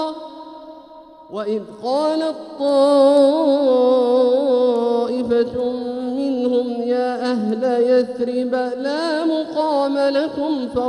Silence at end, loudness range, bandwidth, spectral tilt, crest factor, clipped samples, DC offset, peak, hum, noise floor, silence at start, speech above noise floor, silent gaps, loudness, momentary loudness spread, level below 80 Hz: 0 s; 4 LU; 11 kHz; -5.5 dB/octave; 16 dB; under 0.1%; under 0.1%; -2 dBFS; none; -42 dBFS; 0 s; 25 dB; none; -18 LUFS; 10 LU; -58 dBFS